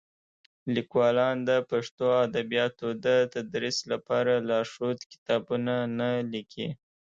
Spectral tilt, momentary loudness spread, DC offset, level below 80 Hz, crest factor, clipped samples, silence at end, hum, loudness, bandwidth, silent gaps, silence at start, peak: -5 dB/octave; 10 LU; under 0.1%; -70 dBFS; 16 dB; under 0.1%; 0.35 s; none; -28 LUFS; 7.8 kHz; 1.91-1.98 s, 5.06-5.10 s, 5.18-5.26 s; 0.65 s; -12 dBFS